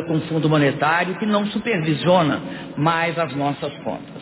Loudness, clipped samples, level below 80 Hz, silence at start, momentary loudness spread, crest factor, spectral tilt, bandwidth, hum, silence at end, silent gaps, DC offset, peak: -20 LUFS; under 0.1%; -56 dBFS; 0 s; 10 LU; 16 dB; -10.5 dB/octave; 4 kHz; none; 0 s; none; under 0.1%; -4 dBFS